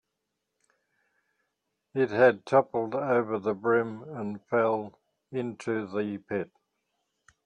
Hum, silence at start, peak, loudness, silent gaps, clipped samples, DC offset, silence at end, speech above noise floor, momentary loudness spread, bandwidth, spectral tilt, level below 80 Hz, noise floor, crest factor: none; 1.95 s; -8 dBFS; -28 LUFS; none; under 0.1%; under 0.1%; 1 s; 56 dB; 14 LU; 9.4 kHz; -7.5 dB/octave; -74 dBFS; -83 dBFS; 22 dB